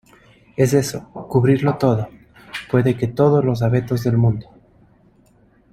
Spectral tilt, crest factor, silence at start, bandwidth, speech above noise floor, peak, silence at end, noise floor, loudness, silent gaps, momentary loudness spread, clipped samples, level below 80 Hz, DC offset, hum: -7.5 dB/octave; 16 dB; 0.6 s; 13.5 kHz; 37 dB; -2 dBFS; 1.3 s; -54 dBFS; -18 LUFS; none; 16 LU; under 0.1%; -48 dBFS; under 0.1%; none